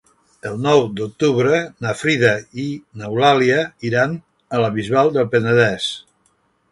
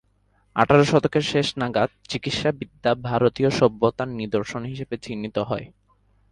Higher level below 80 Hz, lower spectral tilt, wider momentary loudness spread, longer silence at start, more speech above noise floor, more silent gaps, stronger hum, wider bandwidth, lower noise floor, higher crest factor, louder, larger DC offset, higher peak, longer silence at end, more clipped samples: about the same, -56 dBFS vs -52 dBFS; about the same, -5.5 dB/octave vs -6 dB/octave; about the same, 12 LU vs 13 LU; about the same, 0.45 s vs 0.55 s; first, 45 dB vs 41 dB; neither; neither; about the same, 11.5 kHz vs 11.5 kHz; about the same, -62 dBFS vs -64 dBFS; about the same, 18 dB vs 22 dB; first, -18 LUFS vs -23 LUFS; neither; about the same, 0 dBFS vs -2 dBFS; about the same, 0.7 s vs 0.65 s; neither